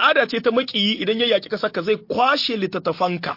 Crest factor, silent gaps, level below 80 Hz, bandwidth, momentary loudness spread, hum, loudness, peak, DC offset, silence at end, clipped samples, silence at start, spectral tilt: 16 dB; none; -66 dBFS; 5.8 kHz; 6 LU; none; -20 LUFS; -4 dBFS; under 0.1%; 0 s; under 0.1%; 0 s; -5 dB/octave